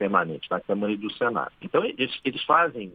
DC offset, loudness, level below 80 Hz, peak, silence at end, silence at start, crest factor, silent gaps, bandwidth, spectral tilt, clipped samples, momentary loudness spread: under 0.1%; -25 LUFS; -66 dBFS; -6 dBFS; 0 s; 0 s; 20 dB; none; 5 kHz; -8 dB/octave; under 0.1%; 8 LU